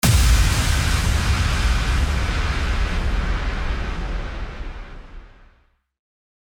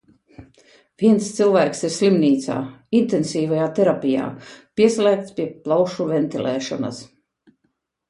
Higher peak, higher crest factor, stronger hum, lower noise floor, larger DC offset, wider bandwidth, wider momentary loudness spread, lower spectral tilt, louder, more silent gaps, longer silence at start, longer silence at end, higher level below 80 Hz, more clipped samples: about the same, -4 dBFS vs -4 dBFS; about the same, 16 dB vs 18 dB; neither; second, -59 dBFS vs -71 dBFS; neither; first, over 20 kHz vs 11.5 kHz; first, 16 LU vs 11 LU; second, -4 dB/octave vs -6 dB/octave; about the same, -22 LUFS vs -20 LUFS; neither; second, 0.05 s vs 0.4 s; first, 1.25 s vs 1.05 s; first, -22 dBFS vs -62 dBFS; neither